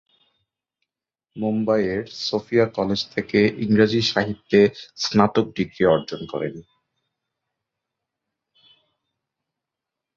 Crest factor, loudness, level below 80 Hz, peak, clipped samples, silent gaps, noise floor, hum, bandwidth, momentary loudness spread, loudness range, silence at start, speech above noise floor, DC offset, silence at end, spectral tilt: 22 dB; -21 LUFS; -56 dBFS; -2 dBFS; under 0.1%; none; -85 dBFS; none; 7.4 kHz; 10 LU; 8 LU; 1.35 s; 65 dB; under 0.1%; 3.55 s; -5.5 dB/octave